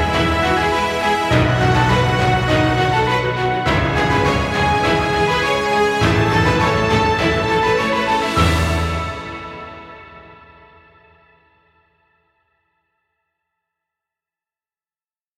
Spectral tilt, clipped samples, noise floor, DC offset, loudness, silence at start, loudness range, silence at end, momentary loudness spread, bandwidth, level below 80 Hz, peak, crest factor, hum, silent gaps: -5.5 dB/octave; under 0.1%; under -90 dBFS; under 0.1%; -16 LUFS; 0 s; 7 LU; 5.05 s; 7 LU; 15.5 kHz; -32 dBFS; 0 dBFS; 18 dB; none; none